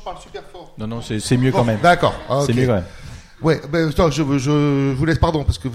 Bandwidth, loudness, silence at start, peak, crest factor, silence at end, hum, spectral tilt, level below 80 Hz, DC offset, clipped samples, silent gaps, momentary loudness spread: 14.5 kHz; -18 LUFS; 0 s; -2 dBFS; 16 dB; 0 s; none; -6.5 dB/octave; -32 dBFS; under 0.1%; under 0.1%; none; 19 LU